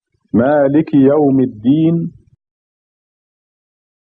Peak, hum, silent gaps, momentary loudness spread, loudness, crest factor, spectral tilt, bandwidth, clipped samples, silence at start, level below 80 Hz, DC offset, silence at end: 0 dBFS; none; none; 8 LU; -13 LUFS; 14 dB; -12 dB/octave; 4 kHz; under 0.1%; 0.35 s; -54 dBFS; under 0.1%; 2 s